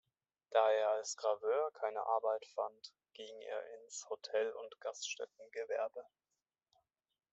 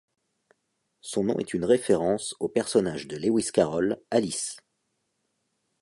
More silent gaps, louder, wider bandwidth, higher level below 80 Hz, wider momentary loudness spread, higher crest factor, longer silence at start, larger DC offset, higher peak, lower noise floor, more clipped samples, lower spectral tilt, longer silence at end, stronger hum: neither; second, -39 LUFS vs -26 LUFS; second, 8.2 kHz vs 11.5 kHz; second, under -90 dBFS vs -60 dBFS; first, 15 LU vs 8 LU; about the same, 22 dB vs 20 dB; second, 0.5 s vs 1.05 s; neither; second, -18 dBFS vs -8 dBFS; first, under -90 dBFS vs -77 dBFS; neither; second, 0.5 dB/octave vs -4.5 dB/octave; about the same, 1.3 s vs 1.2 s; neither